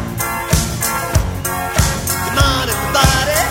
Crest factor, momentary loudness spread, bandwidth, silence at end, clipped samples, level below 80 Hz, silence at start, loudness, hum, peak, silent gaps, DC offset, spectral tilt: 16 dB; 7 LU; 16.5 kHz; 0 s; under 0.1%; -24 dBFS; 0 s; -16 LUFS; none; 0 dBFS; none; under 0.1%; -3.5 dB/octave